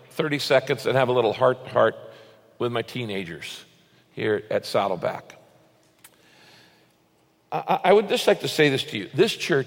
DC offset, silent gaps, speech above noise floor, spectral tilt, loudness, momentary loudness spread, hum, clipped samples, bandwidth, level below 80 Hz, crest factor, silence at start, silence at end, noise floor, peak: under 0.1%; none; 40 dB; -5 dB/octave; -23 LUFS; 14 LU; none; under 0.1%; 17 kHz; -68 dBFS; 20 dB; 0.15 s; 0 s; -63 dBFS; -6 dBFS